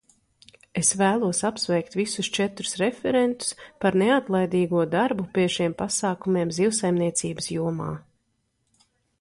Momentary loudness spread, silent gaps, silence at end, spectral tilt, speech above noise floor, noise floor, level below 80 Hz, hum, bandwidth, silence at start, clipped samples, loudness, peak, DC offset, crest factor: 7 LU; none; 1.2 s; -4 dB/octave; 49 dB; -73 dBFS; -60 dBFS; none; 11.5 kHz; 0.75 s; under 0.1%; -24 LUFS; -8 dBFS; under 0.1%; 18 dB